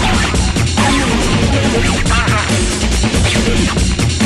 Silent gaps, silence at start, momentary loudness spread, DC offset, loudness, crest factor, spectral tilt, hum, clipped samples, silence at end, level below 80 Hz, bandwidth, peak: none; 0 s; 2 LU; under 0.1%; -13 LUFS; 12 dB; -4.5 dB/octave; none; under 0.1%; 0 s; -18 dBFS; 13.5 kHz; -2 dBFS